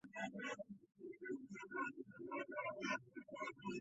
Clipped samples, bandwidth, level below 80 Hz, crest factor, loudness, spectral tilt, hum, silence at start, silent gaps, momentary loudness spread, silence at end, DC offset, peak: under 0.1%; 8 kHz; -86 dBFS; 18 dB; -48 LUFS; -3 dB/octave; none; 0.05 s; none; 10 LU; 0 s; under 0.1%; -30 dBFS